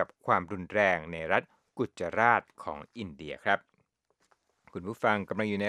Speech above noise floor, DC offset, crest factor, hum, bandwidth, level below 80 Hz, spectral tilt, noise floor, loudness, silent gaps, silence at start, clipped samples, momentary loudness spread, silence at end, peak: 44 dB; under 0.1%; 24 dB; none; 13 kHz; -64 dBFS; -6 dB/octave; -74 dBFS; -30 LUFS; none; 0 s; under 0.1%; 16 LU; 0 s; -8 dBFS